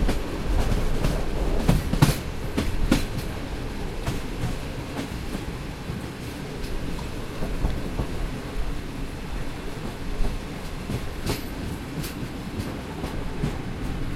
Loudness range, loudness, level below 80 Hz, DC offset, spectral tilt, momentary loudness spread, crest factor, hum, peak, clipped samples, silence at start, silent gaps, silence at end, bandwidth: 7 LU; -30 LUFS; -30 dBFS; under 0.1%; -5.5 dB/octave; 9 LU; 24 dB; none; -2 dBFS; under 0.1%; 0 s; none; 0 s; 16 kHz